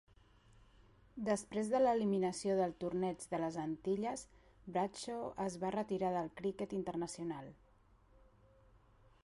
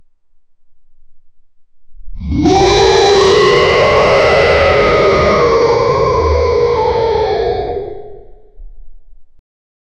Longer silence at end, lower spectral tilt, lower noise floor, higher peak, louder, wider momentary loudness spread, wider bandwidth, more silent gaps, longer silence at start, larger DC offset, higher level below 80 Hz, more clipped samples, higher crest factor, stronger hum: first, 1.7 s vs 0.75 s; about the same, -6 dB/octave vs -5 dB/octave; first, -68 dBFS vs -45 dBFS; second, -22 dBFS vs -2 dBFS; second, -39 LUFS vs -10 LUFS; about the same, 11 LU vs 10 LU; first, 11.5 kHz vs 9.4 kHz; neither; first, 1.15 s vs 0.7 s; neither; second, -68 dBFS vs -28 dBFS; neither; first, 18 dB vs 12 dB; neither